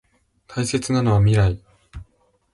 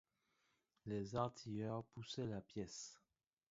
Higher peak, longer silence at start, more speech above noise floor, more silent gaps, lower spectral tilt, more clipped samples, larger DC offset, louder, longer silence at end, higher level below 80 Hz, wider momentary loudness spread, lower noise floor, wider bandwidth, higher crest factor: first, -8 dBFS vs -26 dBFS; second, 0.5 s vs 0.85 s; first, 44 dB vs 37 dB; neither; about the same, -6.5 dB/octave vs -6 dB/octave; neither; neither; first, -20 LUFS vs -48 LUFS; about the same, 0.5 s vs 0.55 s; first, -38 dBFS vs -74 dBFS; first, 14 LU vs 9 LU; second, -62 dBFS vs -84 dBFS; first, 11.5 kHz vs 7.6 kHz; second, 14 dB vs 22 dB